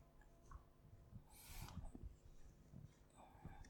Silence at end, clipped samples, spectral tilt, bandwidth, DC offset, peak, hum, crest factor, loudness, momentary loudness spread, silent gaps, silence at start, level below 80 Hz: 0 s; under 0.1%; -5 dB/octave; 19 kHz; under 0.1%; -42 dBFS; none; 18 dB; -62 LUFS; 12 LU; none; 0 s; -62 dBFS